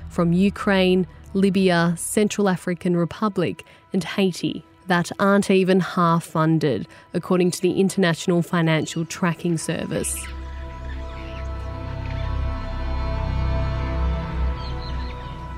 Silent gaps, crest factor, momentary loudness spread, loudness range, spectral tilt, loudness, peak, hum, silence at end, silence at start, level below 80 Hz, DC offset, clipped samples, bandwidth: none; 16 dB; 13 LU; 8 LU; -5.5 dB/octave; -22 LUFS; -6 dBFS; none; 0 s; 0 s; -32 dBFS; under 0.1%; under 0.1%; 15.5 kHz